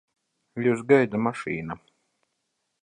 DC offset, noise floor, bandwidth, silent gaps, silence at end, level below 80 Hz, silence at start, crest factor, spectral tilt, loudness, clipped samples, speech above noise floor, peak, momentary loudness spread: under 0.1%; -78 dBFS; 10 kHz; none; 1.05 s; -64 dBFS; 0.55 s; 22 dB; -7.5 dB/octave; -24 LUFS; under 0.1%; 54 dB; -6 dBFS; 19 LU